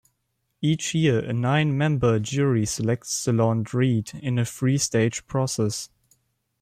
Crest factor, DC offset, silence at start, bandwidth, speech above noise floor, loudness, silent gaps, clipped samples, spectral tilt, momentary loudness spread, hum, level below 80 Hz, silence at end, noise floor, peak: 14 dB; under 0.1%; 0.6 s; 15 kHz; 52 dB; -24 LUFS; none; under 0.1%; -5.5 dB/octave; 5 LU; none; -56 dBFS; 0.75 s; -75 dBFS; -10 dBFS